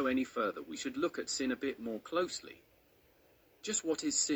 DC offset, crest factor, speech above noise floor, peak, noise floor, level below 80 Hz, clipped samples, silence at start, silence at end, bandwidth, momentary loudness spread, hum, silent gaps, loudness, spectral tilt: under 0.1%; 18 dB; 31 dB; -20 dBFS; -67 dBFS; -72 dBFS; under 0.1%; 0 s; 0 s; over 20 kHz; 9 LU; none; none; -36 LUFS; -2 dB/octave